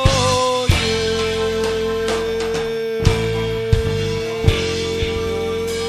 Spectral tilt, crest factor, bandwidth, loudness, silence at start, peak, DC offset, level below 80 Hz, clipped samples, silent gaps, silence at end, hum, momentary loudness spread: -4.5 dB/octave; 18 dB; 14.5 kHz; -19 LUFS; 0 s; 0 dBFS; under 0.1%; -30 dBFS; under 0.1%; none; 0 s; none; 5 LU